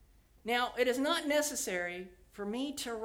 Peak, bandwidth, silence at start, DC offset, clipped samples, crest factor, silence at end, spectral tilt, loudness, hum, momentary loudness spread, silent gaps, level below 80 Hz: -18 dBFS; 20 kHz; 0.45 s; under 0.1%; under 0.1%; 18 dB; 0 s; -2 dB/octave; -33 LUFS; none; 14 LU; none; -64 dBFS